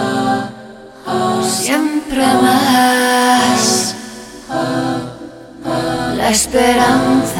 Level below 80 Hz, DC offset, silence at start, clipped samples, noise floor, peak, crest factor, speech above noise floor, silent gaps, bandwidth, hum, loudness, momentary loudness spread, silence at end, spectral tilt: -42 dBFS; under 0.1%; 0 s; under 0.1%; -35 dBFS; 0 dBFS; 14 dB; 23 dB; none; 18 kHz; none; -14 LUFS; 17 LU; 0 s; -3 dB/octave